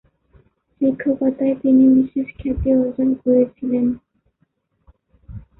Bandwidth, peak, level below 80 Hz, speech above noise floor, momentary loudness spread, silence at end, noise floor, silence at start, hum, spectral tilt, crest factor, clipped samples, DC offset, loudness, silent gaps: 3.2 kHz; -6 dBFS; -40 dBFS; 50 dB; 10 LU; 0.2 s; -67 dBFS; 0.8 s; none; -13.5 dB/octave; 14 dB; under 0.1%; under 0.1%; -18 LUFS; none